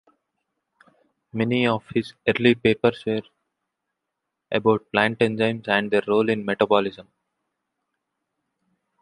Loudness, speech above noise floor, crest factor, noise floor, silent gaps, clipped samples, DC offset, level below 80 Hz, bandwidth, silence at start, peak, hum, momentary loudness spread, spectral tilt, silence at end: -22 LUFS; 60 dB; 22 dB; -82 dBFS; none; under 0.1%; under 0.1%; -60 dBFS; 11 kHz; 1.35 s; -2 dBFS; none; 9 LU; -7 dB/octave; 2 s